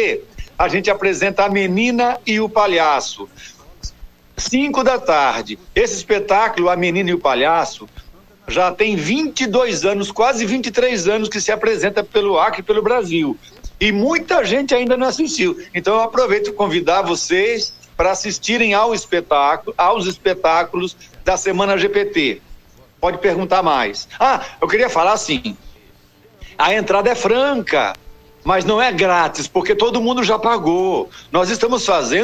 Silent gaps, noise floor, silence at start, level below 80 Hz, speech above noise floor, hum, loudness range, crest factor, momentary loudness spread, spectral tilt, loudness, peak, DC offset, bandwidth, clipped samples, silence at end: none; -49 dBFS; 0 s; -42 dBFS; 33 dB; none; 2 LU; 14 dB; 7 LU; -3.5 dB/octave; -17 LUFS; -4 dBFS; under 0.1%; 15.5 kHz; under 0.1%; 0 s